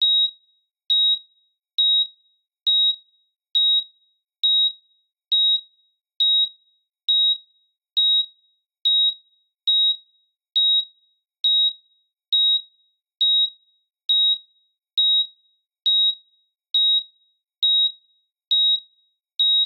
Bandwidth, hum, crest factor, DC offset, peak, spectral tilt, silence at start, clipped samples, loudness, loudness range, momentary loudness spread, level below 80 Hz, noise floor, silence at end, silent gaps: 5 kHz; none; 12 dB; under 0.1%; -12 dBFS; 6.5 dB/octave; 0 s; under 0.1%; -18 LUFS; 1 LU; 9 LU; under -90 dBFS; -66 dBFS; 0 s; 18.47-18.51 s